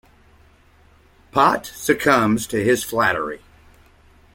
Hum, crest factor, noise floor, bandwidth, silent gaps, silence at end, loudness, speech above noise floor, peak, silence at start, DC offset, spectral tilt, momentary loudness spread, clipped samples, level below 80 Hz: none; 20 dB; -53 dBFS; 17 kHz; none; 0.95 s; -19 LUFS; 34 dB; -2 dBFS; 1.35 s; under 0.1%; -4.5 dB/octave; 9 LU; under 0.1%; -50 dBFS